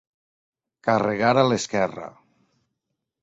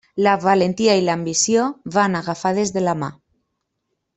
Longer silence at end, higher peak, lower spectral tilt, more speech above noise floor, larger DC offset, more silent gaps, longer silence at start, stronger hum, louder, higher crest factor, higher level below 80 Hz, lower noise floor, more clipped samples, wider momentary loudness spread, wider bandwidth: about the same, 1.15 s vs 1.05 s; about the same, -4 dBFS vs -2 dBFS; about the same, -5 dB/octave vs -4 dB/octave; about the same, 59 dB vs 57 dB; neither; neither; first, 0.85 s vs 0.15 s; neither; second, -22 LUFS vs -19 LUFS; first, 22 dB vs 16 dB; about the same, -62 dBFS vs -60 dBFS; first, -81 dBFS vs -75 dBFS; neither; first, 15 LU vs 6 LU; about the same, 8 kHz vs 8.4 kHz